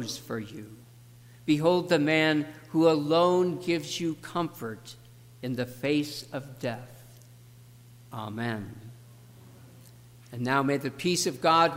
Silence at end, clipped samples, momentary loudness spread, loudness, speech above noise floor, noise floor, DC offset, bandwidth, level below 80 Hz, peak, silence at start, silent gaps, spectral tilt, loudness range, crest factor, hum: 0 s; under 0.1%; 20 LU; -28 LUFS; 25 dB; -52 dBFS; under 0.1%; 16 kHz; -68 dBFS; -10 dBFS; 0 s; none; -5 dB/octave; 14 LU; 18 dB; 60 Hz at -50 dBFS